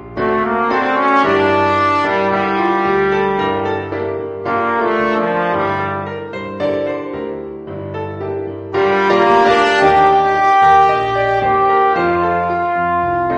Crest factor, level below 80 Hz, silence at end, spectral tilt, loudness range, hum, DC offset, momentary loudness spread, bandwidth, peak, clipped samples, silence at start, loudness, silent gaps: 14 dB; -44 dBFS; 0 s; -6 dB/octave; 8 LU; none; under 0.1%; 13 LU; 9 kHz; 0 dBFS; under 0.1%; 0 s; -15 LUFS; none